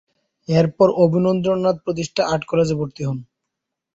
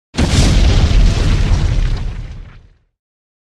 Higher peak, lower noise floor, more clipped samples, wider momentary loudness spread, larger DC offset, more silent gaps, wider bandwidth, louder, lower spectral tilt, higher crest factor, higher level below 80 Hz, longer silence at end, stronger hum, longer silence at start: about the same, -2 dBFS vs 0 dBFS; first, -81 dBFS vs -42 dBFS; neither; second, 12 LU vs 17 LU; neither; neither; second, 8 kHz vs 11.5 kHz; second, -19 LUFS vs -15 LUFS; first, -7 dB/octave vs -5.5 dB/octave; about the same, 16 dB vs 14 dB; second, -54 dBFS vs -16 dBFS; second, 0.7 s vs 0.95 s; neither; first, 0.5 s vs 0.15 s